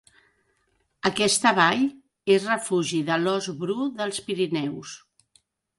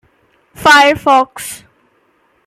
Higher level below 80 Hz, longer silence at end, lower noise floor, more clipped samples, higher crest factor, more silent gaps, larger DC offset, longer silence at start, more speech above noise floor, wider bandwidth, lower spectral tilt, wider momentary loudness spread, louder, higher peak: second, -68 dBFS vs -50 dBFS; about the same, 0.8 s vs 0.9 s; first, -70 dBFS vs -56 dBFS; neither; first, 22 dB vs 14 dB; neither; neither; first, 1.05 s vs 0.6 s; about the same, 47 dB vs 46 dB; second, 11.5 kHz vs 16 kHz; about the same, -3.5 dB/octave vs -2.5 dB/octave; second, 12 LU vs 19 LU; second, -24 LUFS vs -10 LUFS; second, -4 dBFS vs 0 dBFS